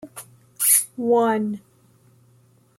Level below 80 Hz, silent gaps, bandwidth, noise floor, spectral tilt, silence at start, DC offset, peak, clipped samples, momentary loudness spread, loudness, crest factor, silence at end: -72 dBFS; none; 16.5 kHz; -57 dBFS; -3 dB/octave; 0.05 s; under 0.1%; -4 dBFS; under 0.1%; 22 LU; -19 LUFS; 20 dB; 1.2 s